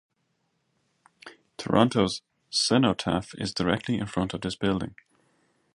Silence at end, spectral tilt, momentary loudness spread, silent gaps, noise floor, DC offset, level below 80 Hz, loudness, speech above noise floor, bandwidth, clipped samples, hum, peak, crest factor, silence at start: 0.85 s; -5 dB/octave; 12 LU; none; -74 dBFS; under 0.1%; -54 dBFS; -26 LUFS; 49 dB; 11.5 kHz; under 0.1%; none; -4 dBFS; 24 dB; 1.25 s